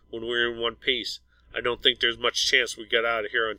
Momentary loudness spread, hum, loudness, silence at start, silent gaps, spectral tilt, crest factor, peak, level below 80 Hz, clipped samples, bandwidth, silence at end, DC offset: 9 LU; none; -24 LUFS; 0.1 s; none; -1.5 dB/octave; 22 dB; -4 dBFS; -56 dBFS; under 0.1%; 16.5 kHz; 0 s; under 0.1%